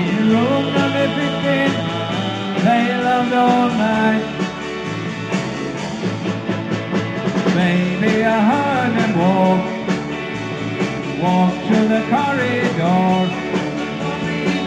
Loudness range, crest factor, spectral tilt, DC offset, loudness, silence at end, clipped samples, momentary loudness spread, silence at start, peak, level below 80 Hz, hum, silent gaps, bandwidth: 4 LU; 16 dB; -6.5 dB/octave; under 0.1%; -18 LUFS; 0 s; under 0.1%; 8 LU; 0 s; -2 dBFS; -50 dBFS; none; none; 9.4 kHz